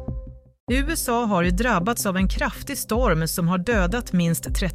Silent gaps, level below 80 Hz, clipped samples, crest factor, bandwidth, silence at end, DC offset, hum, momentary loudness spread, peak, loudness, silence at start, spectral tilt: 0.60-0.67 s; -30 dBFS; under 0.1%; 14 dB; 16 kHz; 0 s; under 0.1%; none; 6 LU; -8 dBFS; -22 LUFS; 0 s; -5 dB/octave